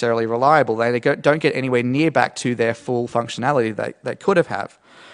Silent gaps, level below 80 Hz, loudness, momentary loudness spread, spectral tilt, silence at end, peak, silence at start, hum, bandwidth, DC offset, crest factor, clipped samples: none; -64 dBFS; -19 LUFS; 9 LU; -6 dB/octave; 0 s; 0 dBFS; 0 s; none; 11 kHz; under 0.1%; 18 dB; under 0.1%